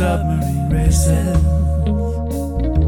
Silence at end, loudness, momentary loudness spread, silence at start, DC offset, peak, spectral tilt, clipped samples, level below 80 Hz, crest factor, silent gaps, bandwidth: 0 s; -18 LUFS; 6 LU; 0 s; under 0.1%; -2 dBFS; -7 dB/octave; under 0.1%; -20 dBFS; 12 dB; none; 15.5 kHz